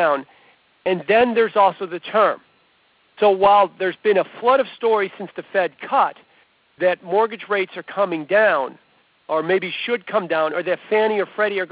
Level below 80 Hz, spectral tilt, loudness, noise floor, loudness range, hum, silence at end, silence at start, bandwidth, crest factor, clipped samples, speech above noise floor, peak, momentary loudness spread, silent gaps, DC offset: -64 dBFS; -8.5 dB/octave; -19 LUFS; -59 dBFS; 3 LU; none; 0.05 s; 0 s; 4 kHz; 16 dB; under 0.1%; 40 dB; -4 dBFS; 8 LU; none; under 0.1%